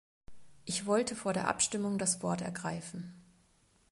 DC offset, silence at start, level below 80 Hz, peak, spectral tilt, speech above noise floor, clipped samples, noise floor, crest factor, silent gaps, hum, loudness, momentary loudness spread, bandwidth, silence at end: under 0.1%; 0.3 s; -66 dBFS; -14 dBFS; -3.5 dB/octave; 35 dB; under 0.1%; -69 dBFS; 22 dB; none; none; -33 LUFS; 14 LU; 11.5 kHz; 0.7 s